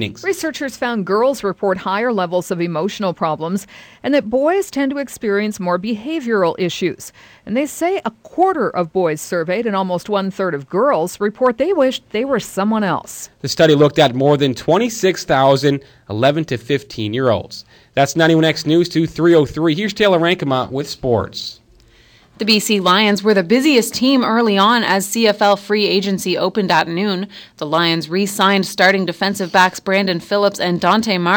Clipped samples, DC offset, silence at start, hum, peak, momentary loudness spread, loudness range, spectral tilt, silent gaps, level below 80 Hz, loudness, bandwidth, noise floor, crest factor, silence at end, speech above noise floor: under 0.1%; under 0.1%; 0 s; none; -2 dBFS; 9 LU; 5 LU; -5 dB/octave; none; -52 dBFS; -16 LUFS; 19 kHz; -49 dBFS; 16 dB; 0 s; 33 dB